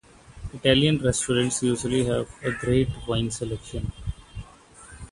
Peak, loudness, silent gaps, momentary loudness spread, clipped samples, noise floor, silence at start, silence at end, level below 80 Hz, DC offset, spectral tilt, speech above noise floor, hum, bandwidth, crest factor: -4 dBFS; -24 LUFS; none; 20 LU; under 0.1%; -49 dBFS; 0.3 s; 0.05 s; -42 dBFS; under 0.1%; -4.5 dB/octave; 25 dB; none; 11.5 kHz; 22 dB